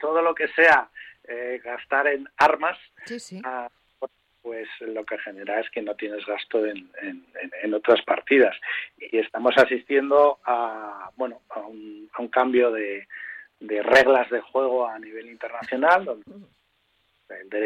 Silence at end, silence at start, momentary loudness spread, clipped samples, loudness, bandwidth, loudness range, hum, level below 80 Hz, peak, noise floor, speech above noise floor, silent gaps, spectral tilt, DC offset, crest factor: 0 s; 0 s; 19 LU; under 0.1%; -22 LUFS; 12 kHz; 9 LU; none; -66 dBFS; -4 dBFS; -68 dBFS; 45 dB; none; -4 dB/octave; under 0.1%; 20 dB